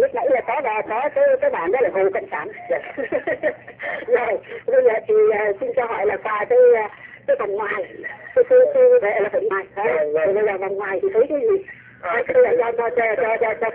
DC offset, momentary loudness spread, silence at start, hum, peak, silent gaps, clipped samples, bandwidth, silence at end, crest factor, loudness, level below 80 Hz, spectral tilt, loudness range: under 0.1%; 11 LU; 0 s; none; -4 dBFS; none; under 0.1%; 3.6 kHz; 0 s; 14 dB; -19 LUFS; -60 dBFS; -8.5 dB/octave; 4 LU